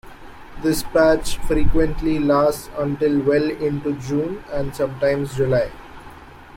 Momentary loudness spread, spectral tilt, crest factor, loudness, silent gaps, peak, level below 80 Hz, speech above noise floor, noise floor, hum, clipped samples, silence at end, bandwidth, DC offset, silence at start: 10 LU; -6 dB/octave; 16 dB; -21 LUFS; none; -4 dBFS; -32 dBFS; 22 dB; -41 dBFS; none; under 0.1%; 0 s; 16.5 kHz; under 0.1%; 0.05 s